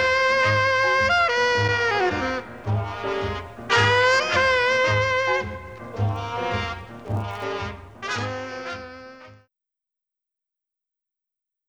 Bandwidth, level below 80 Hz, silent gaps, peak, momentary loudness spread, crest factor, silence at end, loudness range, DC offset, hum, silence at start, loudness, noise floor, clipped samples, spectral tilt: 10.5 kHz; -48 dBFS; none; -8 dBFS; 15 LU; 16 dB; 2.35 s; 14 LU; 0.2%; none; 0 s; -22 LUFS; -87 dBFS; under 0.1%; -4.5 dB/octave